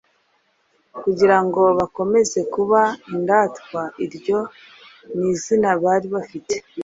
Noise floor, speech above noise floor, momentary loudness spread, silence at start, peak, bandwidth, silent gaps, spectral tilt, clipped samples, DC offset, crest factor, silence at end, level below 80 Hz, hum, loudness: -64 dBFS; 45 dB; 12 LU; 0.95 s; -2 dBFS; 7.8 kHz; none; -5 dB/octave; under 0.1%; under 0.1%; 18 dB; 0 s; -60 dBFS; none; -19 LUFS